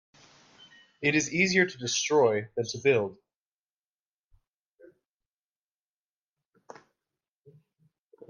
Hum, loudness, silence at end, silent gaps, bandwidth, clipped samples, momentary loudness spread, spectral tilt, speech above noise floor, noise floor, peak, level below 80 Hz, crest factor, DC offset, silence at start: none; -26 LUFS; 5.15 s; none; 10 kHz; under 0.1%; 7 LU; -3.5 dB/octave; over 64 dB; under -90 dBFS; -10 dBFS; -72 dBFS; 22 dB; under 0.1%; 1 s